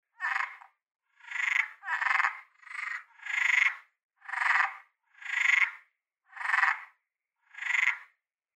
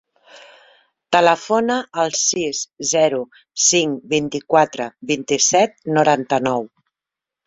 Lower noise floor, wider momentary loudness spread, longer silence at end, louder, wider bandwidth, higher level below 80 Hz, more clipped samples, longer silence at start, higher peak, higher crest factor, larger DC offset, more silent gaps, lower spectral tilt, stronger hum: second, -81 dBFS vs -87 dBFS; first, 15 LU vs 9 LU; second, 0.55 s vs 0.8 s; second, -28 LUFS vs -18 LUFS; first, 14 kHz vs 8.4 kHz; second, under -90 dBFS vs -62 dBFS; neither; second, 0.2 s vs 0.35 s; second, -10 dBFS vs -2 dBFS; about the same, 22 dB vs 18 dB; neither; first, 4.04-4.09 s vs none; second, 8 dB/octave vs -2.5 dB/octave; neither